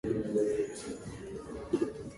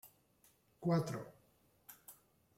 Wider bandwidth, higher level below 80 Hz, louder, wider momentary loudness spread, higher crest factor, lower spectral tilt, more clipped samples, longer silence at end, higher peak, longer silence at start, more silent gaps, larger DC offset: second, 11.5 kHz vs 16.5 kHz; first, -56 dBFS vs -76 dBFS; first, -35 LUFS vs -39 LUFS; second, 12 LU vs 24 LU; second, 16 dB vs 22 dB; about the same, -6.5 dB/octave vs -7 dB/octave; neither; second, 0 s vs 0.45 s; first, -18 dBFS vs -22 dBFS; about the same, 0.05 s vs 0.05 s; neither; neither